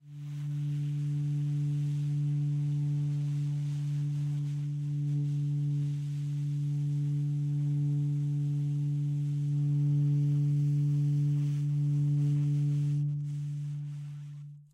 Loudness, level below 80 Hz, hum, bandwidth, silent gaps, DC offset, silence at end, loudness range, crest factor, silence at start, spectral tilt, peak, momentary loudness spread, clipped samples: -31 LUFS; -72 dBFS; none; 6.8 kHz; none; under 0.1%; 0.1 s; 3 LU; 8 dB; 0.05 s; -9 dB/octave; -22 dBFS; 7 LU; under 0.1%